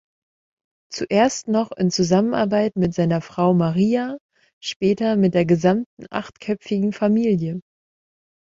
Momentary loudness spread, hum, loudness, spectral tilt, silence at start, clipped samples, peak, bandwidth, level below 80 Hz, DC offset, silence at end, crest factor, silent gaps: 12 LU; none; -20 LUFS; -6.5 dB/octave; 0.9 s; under 0.1%; -4 dBFS; 7.8 kHz; -56 dBFS; under 0.1%; 0.85 s; 16 dB; 4.21-4.29 s, 4.53-4.61 s, 4.76-4.80 s, 5.86-5.97 s